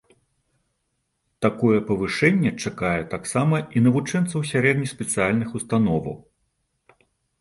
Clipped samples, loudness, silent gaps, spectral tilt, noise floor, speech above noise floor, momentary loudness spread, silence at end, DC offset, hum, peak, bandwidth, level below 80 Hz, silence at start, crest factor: under 0.1%; -22 LUFS; none; -6 dB/octave; -74 dBFS; 53 dB; 6 LU; 1.2 s; under 0.1%; none; -2 dBFS; 11.5 kHz; -52 dBFS; 1.4 s; 20 dB